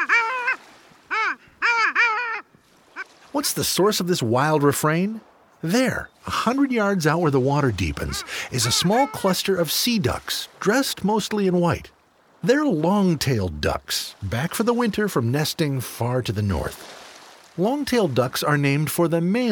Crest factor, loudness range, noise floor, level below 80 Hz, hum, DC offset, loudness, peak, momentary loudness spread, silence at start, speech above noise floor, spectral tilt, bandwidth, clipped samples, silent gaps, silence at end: 18 dB; 3 LU; -56 dBFS; -46 dBFS; none; under 0.1%; -22 LUFS; -6 dBFS; 9 LU; 0 s; 34 dB; -4.5 dB/octave; over 20 kHz; under 0.1%; none; 0 s